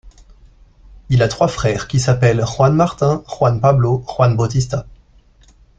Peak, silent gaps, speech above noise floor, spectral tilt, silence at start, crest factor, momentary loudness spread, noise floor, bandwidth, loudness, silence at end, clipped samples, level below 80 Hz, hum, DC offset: -2 dBFS; none; 34 dB; -6.5 dB/octave; 0.05 s; 16 dB; 5 LU; -49 dBFS; 8.8 kHz; -16 LUFS; 0.85 s; under 0.1%; -40 dBFS; none; under 0.1%